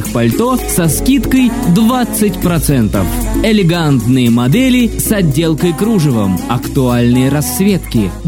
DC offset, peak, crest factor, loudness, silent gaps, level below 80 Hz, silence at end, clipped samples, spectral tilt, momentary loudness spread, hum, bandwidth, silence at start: under 0.1%; 0 dBFS; 12 dB; -12 LUFS; none; -26 dBFS; 0 s; under 0.1%; -5.5 dB/octave; 4 LU; none; 17.5 kHz; 0 s